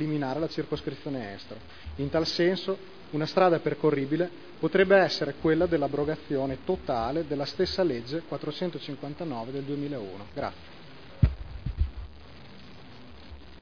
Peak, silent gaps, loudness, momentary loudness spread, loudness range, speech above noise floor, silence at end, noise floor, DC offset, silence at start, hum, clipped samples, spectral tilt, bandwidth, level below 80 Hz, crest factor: -8 dBFS; none; -29 LUFS; 24 LU; 9 LU; 20 dB; 0 s; -48 dBFS; 0.4%; 0 s; none; under 0.1%; -7 dB/octave; 5.4 kHz; -42 dBFS; 22 dB